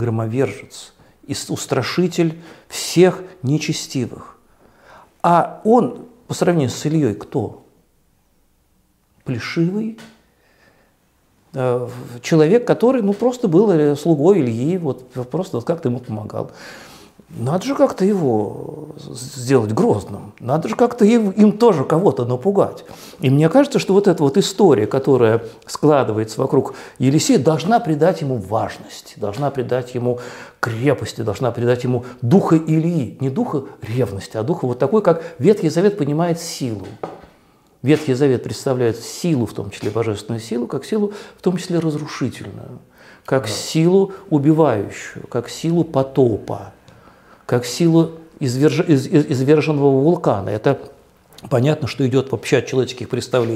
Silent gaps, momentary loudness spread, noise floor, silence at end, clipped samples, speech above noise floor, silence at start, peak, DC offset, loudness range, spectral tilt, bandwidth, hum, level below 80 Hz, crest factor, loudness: none; 14 LU; -60 dBFS; 0 s; under 0.1%; 43 dB; 0 s; -2 dBFS; under 0.1%; 7 LU; -6.5 dB/octave; 15.5 kHz; none; -58 dBFS; 16 dB; -18 LUFS